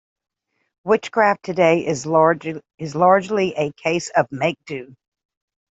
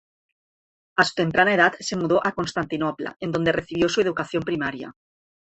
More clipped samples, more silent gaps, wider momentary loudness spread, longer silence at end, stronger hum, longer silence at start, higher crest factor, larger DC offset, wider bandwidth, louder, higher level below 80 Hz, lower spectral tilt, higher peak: neither; second, none vs 3.16-3.20 s; first, 15 LU vs 9 LU; first, 0.85 s vs 0.6 s; neither; about the same, 0.85 s vs 0.95 s; about the same, 18 dB vs 22 dB; neither; about the same, 8.2 kHz vs 8.4 kHz; first, -19 LUFS vs -23 LUFS; second, -64 dBFS vs -56 dBFS; about the same, -5.5 dB/octave vs -5 dB/octave; about the same, -2 dBFS vs -2 dBFS